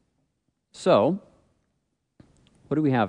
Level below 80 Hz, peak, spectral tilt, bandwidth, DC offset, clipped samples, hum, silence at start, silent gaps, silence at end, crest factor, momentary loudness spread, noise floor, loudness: -68 dBFS; -8 dBFS; -7 dB/octave; 10.5 kHz; under 0.1%; under 0.1%; none; 0.8 s; none; 0 s; 20 dB; 10 LU; -76 dBFS; -24 LUFS